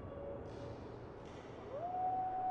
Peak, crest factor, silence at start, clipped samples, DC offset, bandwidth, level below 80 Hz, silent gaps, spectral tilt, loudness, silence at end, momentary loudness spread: -30 dBFS; 12 dB; 0 s; under 0.1%; under 0.1%; 7.8 kHz; -62 dBFS; none; -7.5 dB/octave; -44 LUFS; 0 s; 13 LU